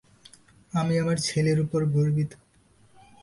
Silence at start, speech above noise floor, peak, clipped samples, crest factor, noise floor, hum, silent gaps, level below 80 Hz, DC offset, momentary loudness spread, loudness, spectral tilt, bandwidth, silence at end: 0.75 s; 36 dB; -14 dBFS; under 0.1%; 14 dB; -60 dBFS; none; none; -58 dBFS; under 0.1%; 6 LU; -25 LUFS; -6 dB/octave; 11.5 kHz; 0.85 s